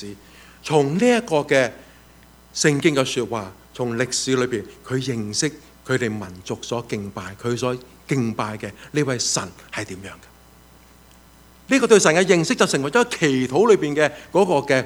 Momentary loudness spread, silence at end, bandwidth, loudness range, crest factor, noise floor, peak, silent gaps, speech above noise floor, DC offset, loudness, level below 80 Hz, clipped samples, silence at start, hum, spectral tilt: 15 LU; 0 s; over 20 kHz; 8 LU; 22 dB; -49 dBFS; 0 dBFS; none; 29 dB; under 0.1%; -20 LUFS; -54 dBFS; under 0.1%; 0 s; none; -4 dB/octave